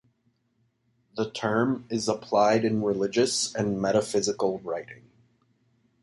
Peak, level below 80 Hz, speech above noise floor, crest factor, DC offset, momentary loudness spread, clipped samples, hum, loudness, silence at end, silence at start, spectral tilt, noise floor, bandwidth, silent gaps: -10 dBFS; -64 dBFS; 46 dB; 18 dB; under 0.1%; 11 LU; under 0.1%; none; -26 LUFS; 1.05 s; 1.15 s; -4.5 dB/octave; -71 dBFS; 11.5 kHz; none